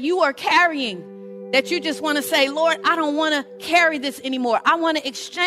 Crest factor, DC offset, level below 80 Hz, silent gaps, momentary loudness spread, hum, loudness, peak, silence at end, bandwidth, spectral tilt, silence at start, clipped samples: 16 dB; under 0.1%; -70 dBFS; none; 9 LU; none; -20 LUFS; -4 dBFS; 0 s; 16 kHz; -2.5 dB/octave; 0 s; under 0.1%